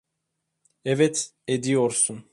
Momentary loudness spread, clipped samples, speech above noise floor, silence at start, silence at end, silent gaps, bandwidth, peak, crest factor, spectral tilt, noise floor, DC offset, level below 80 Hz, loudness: 7 LU; under 0.1%; 56 dB; 0.85 s; 0.1 s; none; 11.5 kHz; -8 dBFS; 18 dB; -4 dB/octave; -80 dBFS; under 0.1%; -68 dBFS; -23 LUFS